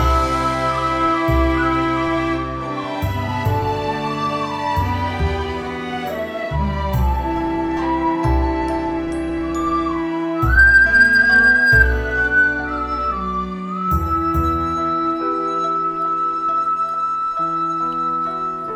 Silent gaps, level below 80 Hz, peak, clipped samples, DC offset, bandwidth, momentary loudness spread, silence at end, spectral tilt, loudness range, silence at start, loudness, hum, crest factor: none; -28 dBFS; -2 dBFS; under 0.1%; under 0.1%; 15 kHz; 12 LU; 0 s; -6.5 dB/octave; 9 LU; 0 s; -18 LUFS; none; 16 dB